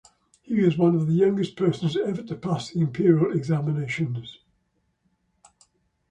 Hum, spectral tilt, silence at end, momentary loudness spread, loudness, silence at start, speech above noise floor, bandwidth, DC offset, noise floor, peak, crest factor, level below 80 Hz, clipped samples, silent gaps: none; -8 dB/octave; 1.8 s; 9 LU; -24 LUFS; 0.5 s; 49 dB; 9.2 kHz; under 0.1%; -72 dBFS; -6 dBFS; 18 dB; -62 dBFS; under 0.1%; none